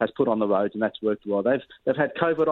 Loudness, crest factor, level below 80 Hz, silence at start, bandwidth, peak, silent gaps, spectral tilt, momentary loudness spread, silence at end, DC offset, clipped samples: -25 LUFS; 16 dB; -66 dBFS; 0 s; 4.2 kHz; -8 dBFS; none; -9 dB/octave; 4 LU; 0 s; under 0.1%; under 0.1%